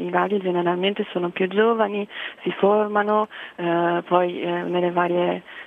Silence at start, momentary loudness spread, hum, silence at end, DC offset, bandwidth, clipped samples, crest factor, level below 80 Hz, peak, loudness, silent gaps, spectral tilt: 0 s; 8 LU; none; 0 s; under 0.1%; 4 kHz; under 0.1%; 18 dB; -74 dBFS; -4 dBFS; -22 LUFS; none; -8 dB/octave